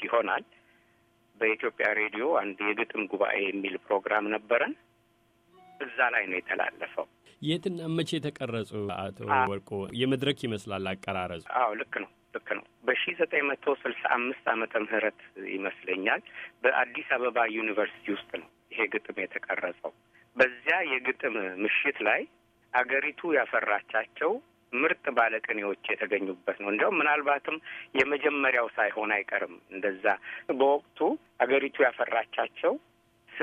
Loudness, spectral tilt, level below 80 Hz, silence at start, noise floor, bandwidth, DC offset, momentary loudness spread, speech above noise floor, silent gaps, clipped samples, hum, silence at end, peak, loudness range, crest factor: -29 LUFS; -5.5 dB/octave; -72 dBFS; 0 s; -67 dBFS; 12 kHz; under 0.1%; 10 LU; 38 dB; none; under 0.1%; none; 0 s; -8 dBFS; 4 LU; 22 dB